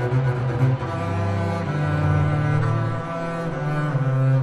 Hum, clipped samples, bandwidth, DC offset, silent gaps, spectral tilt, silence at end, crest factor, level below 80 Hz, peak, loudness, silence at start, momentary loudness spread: none; under 0.1%; 8.8 kHz; under 0.1%; none; -8.5 dB/octave; 0 s; 12 dB; -46 dBFS; -8 dBFS; -23 LUFS; 0 s; 6 LU